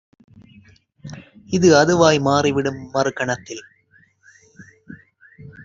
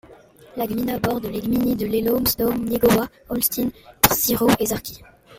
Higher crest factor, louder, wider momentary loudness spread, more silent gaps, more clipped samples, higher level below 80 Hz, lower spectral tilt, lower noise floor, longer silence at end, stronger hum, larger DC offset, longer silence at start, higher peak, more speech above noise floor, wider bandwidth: about the same, 20 dB vs 22 dB; first, -17 LUFS vs -21 LUFS; first, 25 LU vs 10 LU; neither; neither; second, -56 dBFS vs -44 dBFS; about the same, -5 dB/octave vs -4 dB/octave; first, -57 dBFS vs -47 dBFS; about the same, 0 s vs 0 s; neither; neither; first, 1.05 s vs 0.1 s; about the same, -2 dBFS vs 0 dBFS; first, 40 dB vs 26 dB; second, 7.8 kHz vs 16.5 kHz